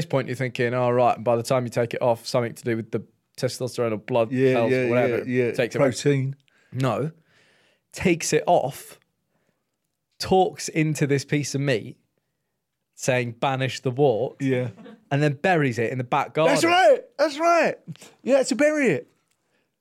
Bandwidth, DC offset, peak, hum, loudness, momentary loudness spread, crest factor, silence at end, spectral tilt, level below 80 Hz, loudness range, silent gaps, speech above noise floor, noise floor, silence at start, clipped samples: 15 kHz; under 0.1%; -8 dBFS; none; -23 LUFS; 10 LU; 14 dB; 0.8 s; -5.5 dB/octave; -64 dBFS; 5 LU; none; 57 dB; -79 dBFS; 0 s; under 0.1%